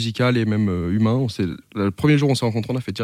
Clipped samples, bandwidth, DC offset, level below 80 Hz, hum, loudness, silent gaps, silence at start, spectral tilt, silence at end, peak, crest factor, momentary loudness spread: under 0.1%; 15 kHz; under 0.1%; -52 dBFS; none; -21 LUFS; none; 0 s; -7 dB/octave; 0 s; -6 dBFS; 14 dB; 8 LU